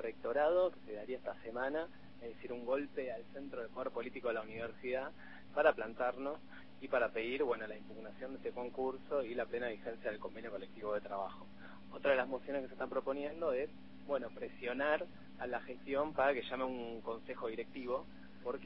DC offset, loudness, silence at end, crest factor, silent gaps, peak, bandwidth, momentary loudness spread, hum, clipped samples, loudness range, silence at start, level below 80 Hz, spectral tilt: 0.2%; -40 LUFS; 0 s; 24 dB; none; -16 dBFS; 5.6 kHz; 14 LU; none; under 0.1%; 4 LU; 0 s; -70 dBFS; -3 dB/octave